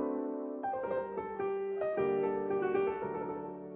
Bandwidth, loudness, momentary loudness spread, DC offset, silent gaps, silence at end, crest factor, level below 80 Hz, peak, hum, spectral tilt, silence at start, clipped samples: 4 kHz; -35 LUFS; 7 LU; under 0.1%; none; 0 s; 16 dB; -68 dBFS; -20 dBFS; none; -6.5 dB/octave; 0 s; under 0.1%